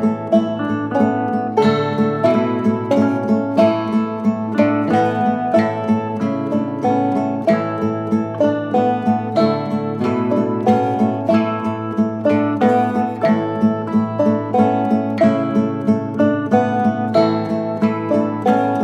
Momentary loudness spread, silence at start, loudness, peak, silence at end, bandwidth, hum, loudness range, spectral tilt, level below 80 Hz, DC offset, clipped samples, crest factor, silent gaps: 5 LU; 0 s; -17 LUFS; -2 dBFS; 0 s; 8.2 kHz; none; 2 LU; -8 dB/octave; -62 dBFS; under 0.1%; under 0.1%; 16 dB; none